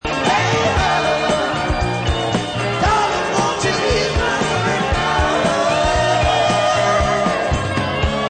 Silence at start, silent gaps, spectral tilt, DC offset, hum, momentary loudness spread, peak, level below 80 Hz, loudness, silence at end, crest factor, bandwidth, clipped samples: 0.05 s; none; -4.5 dB/octave; under 0.1%; none; 4 LU; -4 dBFS; -28 dBFS; -17 LUFS; 0 s; 12 dB; 9.4 kHz; under 0.1%